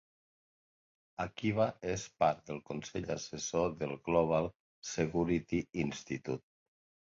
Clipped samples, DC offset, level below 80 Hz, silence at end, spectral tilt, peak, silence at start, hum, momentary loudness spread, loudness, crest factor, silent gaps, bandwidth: under 0.1%; under 0.1%; -60 dBFS; 0.8 s; -5.5 dB/octave; -14 dBFS; 1.2 s; none; 10 LU; -35 LUFS; 22 dB; 4.56-4.82 s; 7.6 kHz